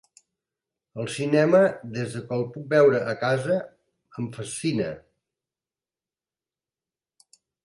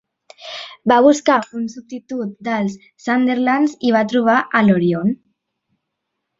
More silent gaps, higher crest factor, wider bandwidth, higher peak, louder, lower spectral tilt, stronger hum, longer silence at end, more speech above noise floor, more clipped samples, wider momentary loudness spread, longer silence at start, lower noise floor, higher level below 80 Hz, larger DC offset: neither; about the same, 20 dB vs 16 dB; first, 11.5 kHz vs 8 kHz; second, -8 dBFS vs -2 dBFS; second, -24 LUFS vs -17 LUFS; about the same, -6 dB/octave vs -6 dB/octave; neither; first, 2.65 s vs 1.25 s; first, over 67 dB vs 60 dB; neither; about the same, 16 LU vs 17 LU; first, 0.95 s vs 0.4 s; first, under -90 dBFS vs -77 dBFS; second, -66 dBFS vs -60 dBFS; neither